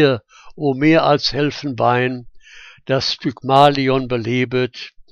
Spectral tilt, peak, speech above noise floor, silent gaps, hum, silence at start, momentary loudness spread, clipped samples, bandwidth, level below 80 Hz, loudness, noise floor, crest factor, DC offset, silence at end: -6 dB/octave; 0 dBFS; 26 dB; none; none; 0 s; 11 LU; under 0.1%; 10 kHz; -46 dBFS; -17 LUFS; -42 dBFS; 18 dB; under 0.1%; 0.25 s